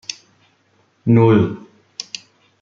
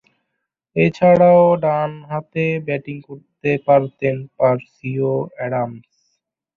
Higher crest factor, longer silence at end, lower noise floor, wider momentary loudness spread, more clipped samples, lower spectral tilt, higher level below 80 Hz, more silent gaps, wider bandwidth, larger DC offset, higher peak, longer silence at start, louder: about the same, 18 dB vs 16 dB; second, 0.6 s vs 0.75 s; second, -60 dBFS vs -77 dBFS; first, 22 LU vs 15 LU; neither; second, -7 dB/octave vs -9 dB/octave; about the same, -54 dBFS vs -58 dBFS; neither; first, 7.4 kHz vs 6.6 kHz; neither; about the same, -2 dBFS vs -2 dBFS; second, 0.1 s vs 0.75 s; first, -15 LUFS vs -18 LUFS